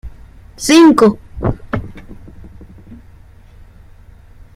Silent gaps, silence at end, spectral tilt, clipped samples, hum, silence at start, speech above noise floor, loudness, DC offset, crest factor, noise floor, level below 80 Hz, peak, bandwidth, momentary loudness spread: none; 1.6 s; -5 dB/octave; under 0.1%; none; 0.05 s; 30 dB; -12 LUFS; under 0.1%; 16 dB; -40 dBFS; -36 dBFS; 0 dBFS; 15.5 kHz; 17 LU